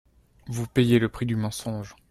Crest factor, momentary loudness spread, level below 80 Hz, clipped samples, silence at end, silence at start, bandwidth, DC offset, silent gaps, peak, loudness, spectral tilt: 18 dB; 14 LU; -52 dBFS; under 0.1%; 0.2 s; 0.45 s; 14.5 kHz; under 0.1%; none; -8 dBFS; -26 LUFS; -6.5 dB/octave